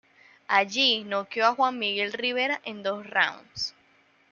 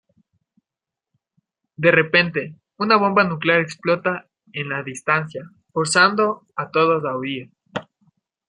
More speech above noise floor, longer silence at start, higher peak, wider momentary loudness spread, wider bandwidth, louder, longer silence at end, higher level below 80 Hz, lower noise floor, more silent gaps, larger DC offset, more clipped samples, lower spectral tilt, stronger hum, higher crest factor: second, 36 dB vs 68 dB; second, 0.5 s vs 1.8 s; second, -6 dBFS vs -2 dBFS; second, 10 LU vs 17 LU; second, 7.2 kHz vs 11 kHz; second, -26 LUFS vs -19 LUFS; about the same, 0.6 s vs 0.65 s; second, -72 dBFS vs -64 dBFS; second, -62 dBFS vs -88 dBFS; neither; neither; neither; second, -2 dB/octave vs -4.5 dB/octave; neither; about the same, 22 dB vs 20 dB